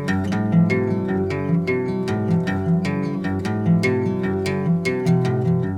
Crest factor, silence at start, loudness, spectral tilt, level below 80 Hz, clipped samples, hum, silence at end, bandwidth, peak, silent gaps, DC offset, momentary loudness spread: 14 dB; 0 s; -21 LUFS; -8 dB/octave; -52 dBFS; under 0.1%; none; 0 s; 10.5 kHz; -6 dBFS; none; under 0.1%; 5 LU